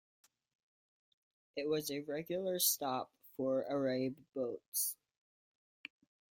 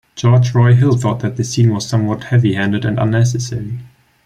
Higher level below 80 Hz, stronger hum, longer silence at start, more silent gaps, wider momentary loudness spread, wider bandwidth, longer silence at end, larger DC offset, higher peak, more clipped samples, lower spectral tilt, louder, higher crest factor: second, -82 dBFS vs -46 dBFS; neither; first, 1.55 s vs 0.15 s; first, 4.68-4.72 s vs none; first, 20 LU vs 10 LU; first, 16.5 kHz vs 9.8 kHz; first, 1.4 s vs 0.4 s; neither; second, -16 dBFS vs -2 dBFS; neither; second, -3 dB/octave vs -6.5 dB/octave; second, -37 LUFS vs -15 LUFS; first, 24 dB vs 12 dB